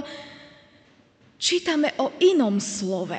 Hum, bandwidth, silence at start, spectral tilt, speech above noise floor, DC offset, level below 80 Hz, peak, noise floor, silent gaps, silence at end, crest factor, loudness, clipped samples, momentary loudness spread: none; 9.2 kHz; 0 s; -3.5 dB/octave; 35 dB; under 0.1%; -70 dBFS; -8 dBFS; -57 dBFS; none; 0 s; 16 dB; -22 LUFS; under 0.1%; 18 LU